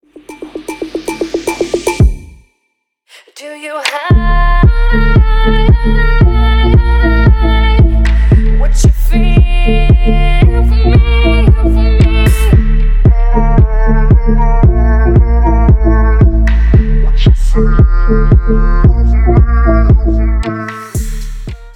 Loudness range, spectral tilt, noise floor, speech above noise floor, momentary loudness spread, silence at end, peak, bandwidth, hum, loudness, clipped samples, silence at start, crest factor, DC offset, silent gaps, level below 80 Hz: 5 LU; -7 dB/octave; -66 dBFS; 57 dB; 11 LU; 0.05 s; 0 dBFS; 12 kHz; none; -11 LUFS; under 0.1%; 0.3 s; 8 dB; under 0.1%; none; -8 dBFS